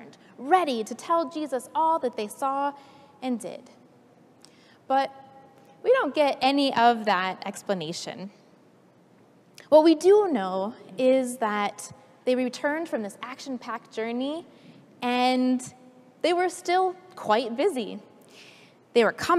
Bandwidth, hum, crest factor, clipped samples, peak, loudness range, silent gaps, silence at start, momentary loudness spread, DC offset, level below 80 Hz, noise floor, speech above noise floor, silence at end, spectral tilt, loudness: 14.5 kHz; none; 20 dB; under 0.1%; -6 dBFS; 7 LU; none; 0 s; 15 LU; under 0.1%; -78 dBFS; -57 dBFS; 33 dB; 0 s; -4 dB/octave; -25 LUFS